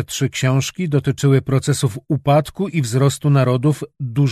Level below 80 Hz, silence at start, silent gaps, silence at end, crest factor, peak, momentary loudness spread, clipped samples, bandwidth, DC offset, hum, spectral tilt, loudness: -50 dBFS; 0 s; none; 0 s; 14 dB; -2 dBFS; 6 LU; under 0.1%; 13.5 kHz; under 0.1%; none; -6 dB/octave; -18 LUFS